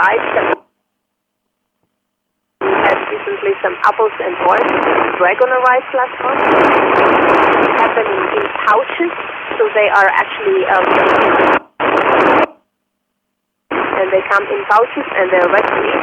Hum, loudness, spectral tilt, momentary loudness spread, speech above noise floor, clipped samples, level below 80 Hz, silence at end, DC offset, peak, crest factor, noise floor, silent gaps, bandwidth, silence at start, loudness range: none; -13 LUFS; -5.5 dB/octave; 8 LU; 60 dB; under 0.1%; -52 dBFS; 0 s; under 0.1%; 0 dBFS; 14 dB; -72 dBFS; none; 9.2 kHz; 0 s; 6 LU